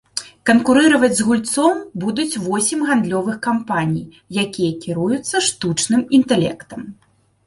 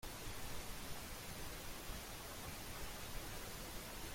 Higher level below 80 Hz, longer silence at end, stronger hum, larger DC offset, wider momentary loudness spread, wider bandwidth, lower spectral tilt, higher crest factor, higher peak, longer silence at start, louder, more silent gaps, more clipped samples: about the same, -56 dBFS vs -54 dBFS; first, 0.55 s vs 0 s; neither; neither; first, 11 LU vs 1 LU; second, 11.5 kHz vs 16.5 kHz; about the same, -4 dB/octave vs -3 dB/octave; about the same, 16 dB vs 14 dB; first, -2 dBFS vs -34 dBFS; first, 0.15 s vs 0 s; first, -17 LUFS vs -49 LUFS; neither; neither